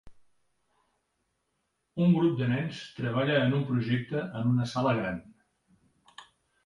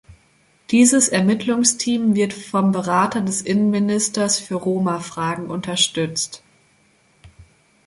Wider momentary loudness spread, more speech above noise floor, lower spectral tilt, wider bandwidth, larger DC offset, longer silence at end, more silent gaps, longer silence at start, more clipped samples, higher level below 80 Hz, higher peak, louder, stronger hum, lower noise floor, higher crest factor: about the same, 10 LU vs 9 LU; first, 51 dB vs 39 dB; first, -7.5 dB/octave vs -3.5 dB/octave; about the same, 11 kHz vs 11.5 kHz; neither; about the same, 0.4 s vs 0.45 s; neither; about the same, 0.05 s vs 0.1 s; neither; about the same, -62 dBFS vs -58 dBFS; second, -12 dBFS vs -2 dBFS; second, -28 LUFS vs -19 LUFS; neither; first, -79 dBFS vs -58 dBFS; about the same, 18 dB vs 18 dB